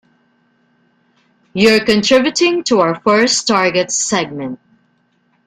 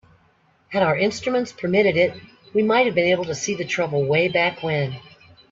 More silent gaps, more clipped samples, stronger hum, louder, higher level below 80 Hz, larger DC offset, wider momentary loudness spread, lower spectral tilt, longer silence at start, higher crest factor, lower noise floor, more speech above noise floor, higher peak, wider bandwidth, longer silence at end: neither; neither; neither; first, -13 LUFS vs -21 LUFS; first, -54 dBFS vs -60 dBFS; neither; first, 14 LU vs 7 LU; second, -3 dB/octave vs -5 dB/octave; first, 1.55 s vs 0.7 s; about the same, 16 dB vs 18 dB; about the same, -60 dBFS vs -60 dBFS; first, 46 dB vs 39 dB; first, 0 dBFS vs -4 dBFS; first, 15 kHz vs 7.8 kHz; first, 0.9 s vs 0.5 s